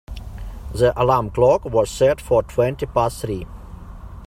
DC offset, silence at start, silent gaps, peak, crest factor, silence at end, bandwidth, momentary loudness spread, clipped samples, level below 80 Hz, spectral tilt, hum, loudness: under 0.1%; 0.1 s; none; -2 dBFS; 18 dB; 0 s; 15.5 kHz; 21 LU; under 0.1%; -36 dBFS; -6 dB/octave; none; -19 LUFS